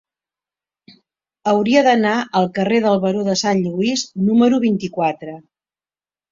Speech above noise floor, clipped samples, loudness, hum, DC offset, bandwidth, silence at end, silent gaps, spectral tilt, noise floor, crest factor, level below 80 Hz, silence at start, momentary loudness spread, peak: over 74 dB; under 0.1%; -17 LUFS; none; under 0.1%; 7.6 kHz; 0.9 s; none; -5 dB/octave; under -90 dBFS; 18 dB; -60 dBFS; 1.45 s; 8 LU; -2 dBFS